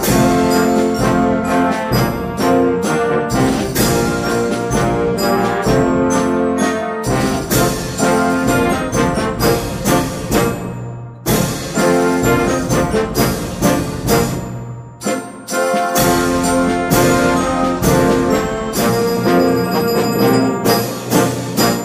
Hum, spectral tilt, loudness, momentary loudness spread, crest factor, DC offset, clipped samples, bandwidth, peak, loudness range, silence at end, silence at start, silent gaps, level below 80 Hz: none; -5 dB/octave; -15 LUFS; 5 LU; 14 dB; under 0.1%; under 0.1%; 15.5 kHz; 0 dBFS; 2 LU; 0 s; 0 s; none; -34 dBFS